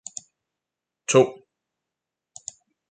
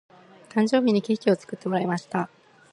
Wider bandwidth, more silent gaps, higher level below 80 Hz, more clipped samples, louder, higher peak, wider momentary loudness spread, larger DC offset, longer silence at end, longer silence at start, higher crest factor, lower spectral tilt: second, 9.4 kHz vs 10.5 kHz; neither; about the same, -72 dBFS vs -72 dBFS; neither; first, -21 LUFS vs -25 LUFS; about the same, -6 dBFS vs -8 dBFS; first, 21 LU vs 9 LU; neither; first, 1.6 s vs 0.45 s; first, 1.1 s vs 0.55 s; about the same, 22 dB vs 18 dB; second, -4 dB/octave vs -6.5 dB/octave